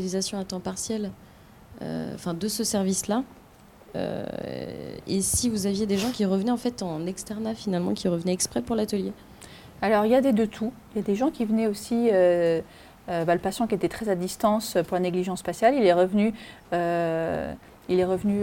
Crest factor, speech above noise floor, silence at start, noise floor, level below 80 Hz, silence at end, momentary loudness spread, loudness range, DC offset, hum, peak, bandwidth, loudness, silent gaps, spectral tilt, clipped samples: 16 dB; 26 dB; 0 s; -51 dBFS; -54 dBFS; 0 s; 14 LU; 6 LU; under 0.1%; none; -8 dBFS; 17 kHz; -26 LUFS; none; -5 dB/octave; under 0.1%